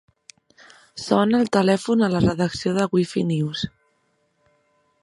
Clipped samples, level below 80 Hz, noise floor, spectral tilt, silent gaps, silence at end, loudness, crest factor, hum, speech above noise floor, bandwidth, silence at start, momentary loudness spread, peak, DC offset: under 0.1%; -50 dBFS; -67 dBFS; -6.5 dB/octave; none; 1.35 s; -21 LUFS; 20 dB; none; 47 dB; 11.5 kHz; 0.95 s; 11 LU; -2 dBFS; under 0.1%